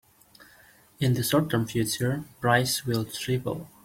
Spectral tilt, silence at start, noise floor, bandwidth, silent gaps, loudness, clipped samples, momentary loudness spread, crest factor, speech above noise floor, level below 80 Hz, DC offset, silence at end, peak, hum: -5 dB/octave; 0.4 s; -56 dBFS; 16.5 kHz; none; -26 LUFS; under 0.1%; 6 LU; 20 dB; 30 dB; -58 dBFS; under 0.1%; 0.15 s; -8 dBFS; none